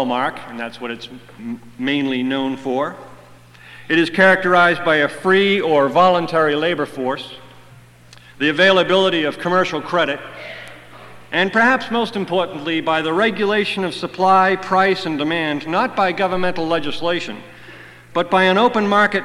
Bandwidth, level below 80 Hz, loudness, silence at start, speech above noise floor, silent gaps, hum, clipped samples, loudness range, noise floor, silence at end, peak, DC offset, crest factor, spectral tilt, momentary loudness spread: 13 kHz; -54 dBFS; -17 LUFS; 0 s; 27 dB; none; 60 Hz at -50 dBFS; under 0.1%; 6 LU; -44 dBFS; 0 s; -2 dBFS; under 0.1%; 16 dB; -5.5 dB/octave; 15 LU